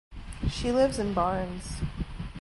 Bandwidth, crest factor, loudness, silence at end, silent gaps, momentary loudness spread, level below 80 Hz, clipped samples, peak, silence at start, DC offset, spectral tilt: 11.5 kHz; 18 dB; -30 LUFS; 0 s; none; 12 LU; -38 dBFS; under 0.1%; -12 dBFS; 0.1 s; under 0.1%; -6 dB/octave